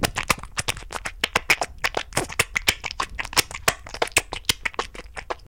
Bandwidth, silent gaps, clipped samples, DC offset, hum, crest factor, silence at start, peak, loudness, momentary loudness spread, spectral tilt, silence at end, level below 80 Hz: 17 kHz; none; under 0.1%; 0.3%; none; 22 dB; 0 s; -4 dBFS; -24 LUFS; 10 LU; -1.5 dB/octave; 0 s; -42 dBFS